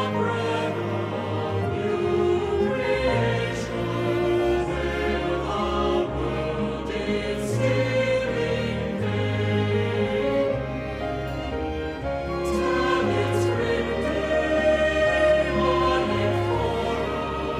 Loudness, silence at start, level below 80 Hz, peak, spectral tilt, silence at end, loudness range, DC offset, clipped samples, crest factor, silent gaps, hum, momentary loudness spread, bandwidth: -24 LUFS; 0 s; -38 dBFS; -10 dBFS; -6.5 dB/octave; 0 s; 4 LU; under 0.1%; under 0.1%; 14 dB; none; none; 7 LU; 13.5 kHz